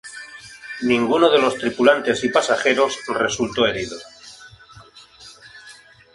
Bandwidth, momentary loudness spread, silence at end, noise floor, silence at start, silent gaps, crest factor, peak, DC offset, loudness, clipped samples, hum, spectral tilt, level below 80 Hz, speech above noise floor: 11.5 kHz; 23 LU; 0.4 s; -46 dBFS; 0.05 s; none; 20 dB; -2 dBFS; under 0.1%; -19 LUFS; under 0.1%; none; -3.5 dB/octave; -56 dBFS; 28 dB